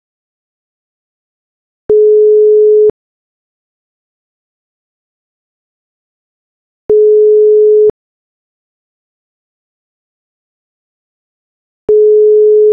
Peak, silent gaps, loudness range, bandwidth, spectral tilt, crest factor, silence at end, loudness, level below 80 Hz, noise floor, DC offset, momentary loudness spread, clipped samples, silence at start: -2 dBFS; 2.90-6.89 s, 7.90-11.88 s; 7 LU; 1.2 kHz; -11 dB/octave; 10 dB; 0 s; -7 LUFS; -54 dBFS; under -90 dBFS; under 0.1%; 6 LU; under 0.1%; 1.9 s